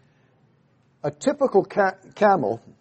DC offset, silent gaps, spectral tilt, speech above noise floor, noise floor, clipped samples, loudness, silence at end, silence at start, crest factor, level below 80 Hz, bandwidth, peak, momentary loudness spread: under 0.1%; none; -6 dB/octave; 40 dB; -62 dBFS; under 0.1%; -22 LUFS; 0.25 s; 1.05 s; 18 dB; -68 dBFS; 8.4 kHz; -4 dBFS; 10 LU